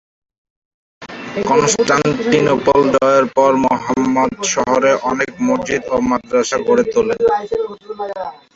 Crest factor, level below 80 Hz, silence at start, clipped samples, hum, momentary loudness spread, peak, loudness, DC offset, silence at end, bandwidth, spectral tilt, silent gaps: 14 dB; -48 dBFS; 1 s; under 0.1%; none; 12 LU; 0 dBFS; -15 LUFS; under 0.1%; 0.2 s; 8.2 kHz; -4 dB/octave; none